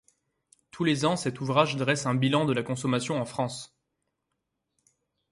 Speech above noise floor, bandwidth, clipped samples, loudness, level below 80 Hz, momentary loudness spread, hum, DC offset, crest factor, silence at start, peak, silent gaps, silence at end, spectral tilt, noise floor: 55 dB; 11.5 kHz; under 0.1%; -27 LUFS; -66 dBFS; 8 LU; none; under 0.1%; 22 dB; 0.75 s; -8 dBFS; none; 1.65 s; -5 dB/octave; -82 dBFS